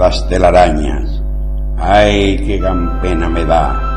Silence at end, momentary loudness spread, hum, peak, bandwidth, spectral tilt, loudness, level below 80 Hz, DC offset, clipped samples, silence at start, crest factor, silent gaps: 0 s; 12 LU; none; 0 dBFS; 9.2 kHz; -6.5 dB/octave; -13 LUFS; -16 dBFS; 1%; under 0.1%; 0 s; 12 dB; none